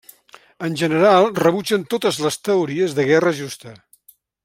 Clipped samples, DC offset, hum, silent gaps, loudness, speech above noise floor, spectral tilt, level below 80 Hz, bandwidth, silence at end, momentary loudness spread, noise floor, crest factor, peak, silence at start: under 0.1%; under 0.1%; none; none; -18 LUFS; 36 dB; -5 dB/octave; -64 dBFS; 16.5 kHz; 0.7 s; 14 LU; -54 dBFS; 18 dB; -2 dBFS; 0.6 s